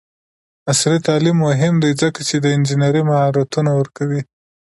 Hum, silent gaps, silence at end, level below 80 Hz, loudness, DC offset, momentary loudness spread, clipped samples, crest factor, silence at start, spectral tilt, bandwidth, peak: none; none; 0.45 s; -56 dBFS; -16 LUFS; under 0.1%; 7 LU; under 0.1%; 14 dB; 0.65 s; -5.5 dB/octave; 11.5 kHz; -2 dBFS